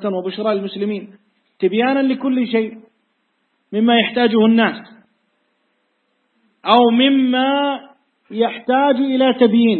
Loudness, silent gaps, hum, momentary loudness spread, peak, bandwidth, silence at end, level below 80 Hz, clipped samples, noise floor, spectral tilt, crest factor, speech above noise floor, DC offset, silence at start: -16 LUFS; none; none; 12 LU; 0 dBFS; 4.4 kHz; 0 s; -66 dBFS; under 0.1%; -67 dBFS; -8.5 dB/octave; 18 dB; 51 dB; under 0.1%; 0 s